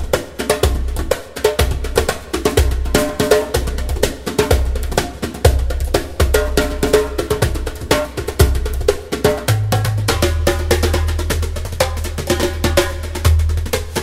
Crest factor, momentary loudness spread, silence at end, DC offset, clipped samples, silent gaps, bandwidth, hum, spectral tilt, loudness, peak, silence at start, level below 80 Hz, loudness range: 16 dB; 5 LU; 0 s; under 0.1%; under 0.1%; none; 16.5 kHz; none; -5 dB/octave; -18 LUFS; 0 dBFS; 0 s; -22 dBFS; 1 LU